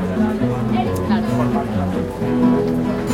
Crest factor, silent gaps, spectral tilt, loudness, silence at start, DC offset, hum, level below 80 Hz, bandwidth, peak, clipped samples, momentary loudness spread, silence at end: 14 dB; none; -7.5 dB/octave; -19 LUFS; 0 s; under 0.1%; none; -38 dBFS; 15.5 kHz; -4 dBFS; under 0.1%; 5 LU; 0 s